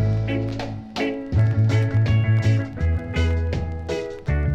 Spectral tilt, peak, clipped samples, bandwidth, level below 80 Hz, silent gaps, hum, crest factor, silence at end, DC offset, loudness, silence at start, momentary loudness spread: -7.5 dB/octave; -10 dBFS; under 0.1%; 7.8 kHz; -30 dBFS; none; none; 12 dB; 0 s; under 0.1%; -22 LUFS; 0 s; 9 LU